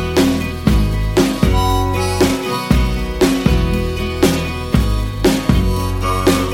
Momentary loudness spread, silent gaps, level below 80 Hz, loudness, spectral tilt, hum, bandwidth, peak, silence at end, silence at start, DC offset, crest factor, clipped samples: 4 LU; none; -20 dBFS; -16 LUFS; -5.5 dB/octave; none; 17 kHz; 0 dBFS; 0 s; 0 s; under 0.1%; 14 dB; under 0.1%